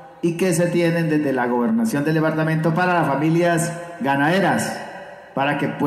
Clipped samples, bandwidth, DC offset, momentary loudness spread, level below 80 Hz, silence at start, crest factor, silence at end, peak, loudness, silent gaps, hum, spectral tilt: under 0.1%; 14 kHz; under 0.1%; 8 LU; -62 dBFS; 0 s; 10 dB; 0 s; -8 dBFS; -20 LUFS; none; none; -6 dB/octave